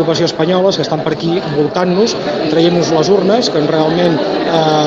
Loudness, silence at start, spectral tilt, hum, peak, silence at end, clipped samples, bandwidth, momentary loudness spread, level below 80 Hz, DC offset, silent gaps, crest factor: -13 LUFS; 0 s; -5.5 dB/octave; none; 0 dBFS; 0 s; under 0.1%; 7.8 kHz; 4 LU; -48 dBFS; under 0.1%; none; 12 dB